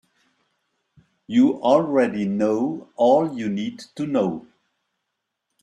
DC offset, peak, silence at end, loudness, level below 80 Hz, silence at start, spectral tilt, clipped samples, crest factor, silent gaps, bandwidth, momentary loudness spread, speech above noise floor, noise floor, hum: under 0.1%; -4 dBFS; 1.2 s; -21 LUFS; -66 dBFS; 1.3 s; -7 dB/octave; under 0.1%; 18 dB; none; 9.4 kHz; 10 LU; 59 dB; -80 dBFS; none